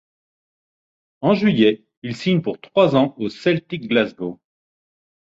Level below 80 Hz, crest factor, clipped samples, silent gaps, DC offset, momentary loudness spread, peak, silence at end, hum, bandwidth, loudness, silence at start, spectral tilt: -60 dBFS; 18 dB; under 0.1%; 1.97-2.02 s; under 0.1%; 12 LU; -2 dBFS; 1 s; none; 7.8 kHz; -19 LUFS; 1.2 s; -7.5 dB/octave